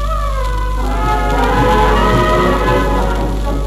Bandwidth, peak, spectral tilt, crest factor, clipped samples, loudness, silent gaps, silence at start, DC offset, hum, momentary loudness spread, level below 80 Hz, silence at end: 14 kHz; -2 dBFS; -6 dB/octave; 12 dB; under 0.1%; -14 LUFS; none; 0 s; under 0.1%; 50 Hz at -15 dBFS; 7 LU; -18 dBFS; 0 s